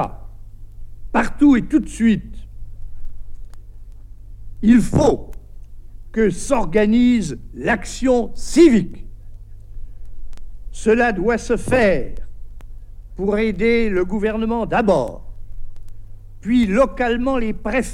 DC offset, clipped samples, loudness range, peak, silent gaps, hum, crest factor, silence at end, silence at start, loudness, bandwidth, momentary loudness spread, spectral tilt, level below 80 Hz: under 0.1%; under 0.1%; 4 LU; -2 dBFS; none; none; 16 dB; 0 s; 0 s; -18 LUFS; 12.5 kHz; 14 LU; -6 dB/octave; -32 dBFS